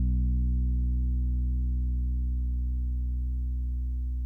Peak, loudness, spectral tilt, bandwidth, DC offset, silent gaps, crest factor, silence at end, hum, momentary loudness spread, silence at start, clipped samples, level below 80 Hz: -20 dBFS; -31 LUFS; -12 dB/octave; 0.4 kHz; under 0.1%; none; 8 dB; 0 s; 60 Hz at -75 dBFS; 5 LU; 0 s; under 0.1%; -28 dBFS